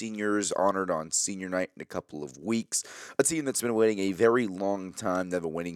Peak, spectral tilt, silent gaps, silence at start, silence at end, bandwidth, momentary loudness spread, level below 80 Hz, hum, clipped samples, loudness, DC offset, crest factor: -10 dBFS; -3.5 dB/octave; none; 0 s; 0 s; 17.5 kHz; 10 LU; -72 dBFS; none; under 0.1%; -28 LUFS; under 0.1%; 18 dB